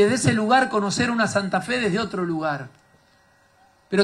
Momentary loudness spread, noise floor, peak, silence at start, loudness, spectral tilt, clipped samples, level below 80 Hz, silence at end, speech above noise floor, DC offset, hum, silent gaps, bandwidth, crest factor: 8 LU; -58 dBFS; -6 dBFS; 0 s; -22 LUFS; -4.5 dB/octave; under 0.1%; -58 dBFS; 0 s; 37 dB; under 0.1%; none; none; 12.5 kHz; 16 dB